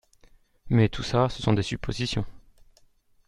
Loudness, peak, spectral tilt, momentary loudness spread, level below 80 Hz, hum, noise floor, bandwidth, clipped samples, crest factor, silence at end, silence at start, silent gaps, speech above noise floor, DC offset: -26 LUFS; -6 dBFS; -6.5 dB/octave; 8 LU; -44 dBFS; none; -60 dBFS; 10.5 kHz; under 0.1%; 22 dB; 0.9 s; 0.65 s; none; 36 dB; under 0.1%